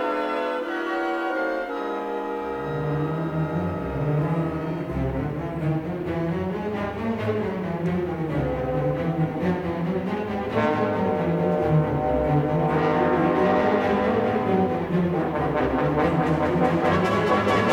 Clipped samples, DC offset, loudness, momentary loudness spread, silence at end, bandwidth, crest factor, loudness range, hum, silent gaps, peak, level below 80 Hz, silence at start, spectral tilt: under 0.1%; under 0.1%; -24 LUFS; 7 LU; 0 s; 11.5 kHz; 16 dB; 5 LU; none; none; -8 dBFS; -44 dBFS; 0 s; -8 dB/octave